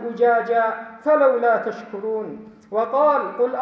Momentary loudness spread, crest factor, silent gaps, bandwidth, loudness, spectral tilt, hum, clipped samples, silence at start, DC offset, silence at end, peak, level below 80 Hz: 12 LU; 14 dB; none; 6.2 kHz; -20 LUFS; -7 dB/octave; none; under 0.1%; 0 s; under 0.1%; 0 s; -6 dBFS; -72 dBFS